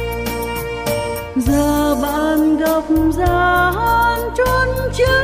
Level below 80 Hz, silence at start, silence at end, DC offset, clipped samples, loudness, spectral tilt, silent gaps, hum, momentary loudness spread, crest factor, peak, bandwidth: -28 dBFS; 0 s; 0 s; under 0.1%; under 0.1%; -16 LUFS; -5.5 dB/octave; none; none; 7 LU; 12 dB; -4 dBFS; 16 kHz